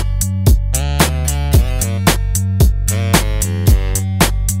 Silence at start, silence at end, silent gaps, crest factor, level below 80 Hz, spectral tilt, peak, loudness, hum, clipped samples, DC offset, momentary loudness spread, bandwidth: 0 s; 0 s; none; 12 dB; -16 dBFS; -4.5 dB/octave; 0 dBFS; -15 LUFS; none; under 0.1%; under 0.1%; 4 LU; 16.5 kHz